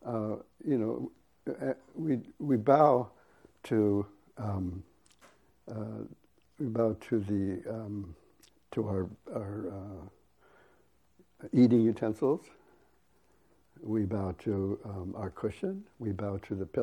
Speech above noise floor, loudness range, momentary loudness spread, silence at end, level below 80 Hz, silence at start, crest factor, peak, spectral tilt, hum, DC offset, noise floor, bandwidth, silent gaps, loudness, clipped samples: 38 dB; 8 LU; 18 LU; 0 s; -64 dBFS; 0 s; 24 dB; -10 dBFS; -9.5 dB/octave; none; under 0.1%; -69 dBFS; 11.5 kHz; none; -32 LUFS; under 0.1%